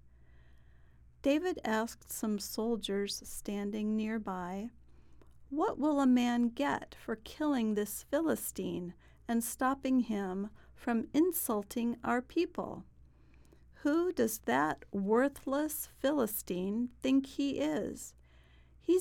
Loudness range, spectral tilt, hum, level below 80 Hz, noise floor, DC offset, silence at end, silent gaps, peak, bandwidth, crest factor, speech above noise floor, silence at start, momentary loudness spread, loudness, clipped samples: 3 LU; -4.5 dB/octave; none; -60 dBFS; -60 dBFS; under 0.1%; 0 s; none; -18 dBFS; 18.5 kHz; 18 dB; 27 dB; 0.05 s; 11 LU; -34 LUFS; under 0.1%